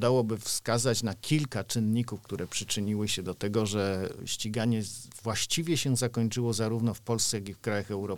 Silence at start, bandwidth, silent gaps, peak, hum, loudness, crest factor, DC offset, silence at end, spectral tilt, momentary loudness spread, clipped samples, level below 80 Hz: 0 s; 19 kHz; none; -12 dBFS; none; -30 LUFS; 18 dB; 0.3%; 0 s; -4.5 dB/octave; 6 LU; under 0.1%; -60 dBFS